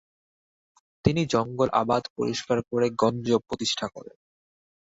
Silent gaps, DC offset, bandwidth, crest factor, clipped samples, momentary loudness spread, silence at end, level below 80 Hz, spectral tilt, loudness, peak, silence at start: 2.10-2.16 s; under 0.1%; 8 kHz; 24 dB; under 0.1%; 6 LU; 0.9 s; -52 dBFS; -5.5 dB/octave; -26 LUFS; -4 dBFS; 1.05 s